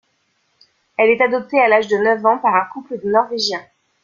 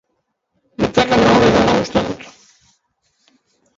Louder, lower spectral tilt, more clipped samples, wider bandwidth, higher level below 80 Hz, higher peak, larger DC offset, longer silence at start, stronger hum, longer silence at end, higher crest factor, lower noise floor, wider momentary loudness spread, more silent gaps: about the same, -16 LUFS vs -14 LUFS; second, -4 dB/octave vs -5.5 dB/octave; neither; about the same, 7.4 kHz vs 7.8 kHz; second, -64 dBFS vs -40 dBFS; about the same, -2 dBFS vs 0 dBFS; neither; first, 1 s vs 0.8 s; neither; second, 0.45 s vs 1.5 s; about the same, 16 dB vs 18 dB; second, -65 dBFS vs -71 dBFS; second, 12 LU vs 16 LU; neither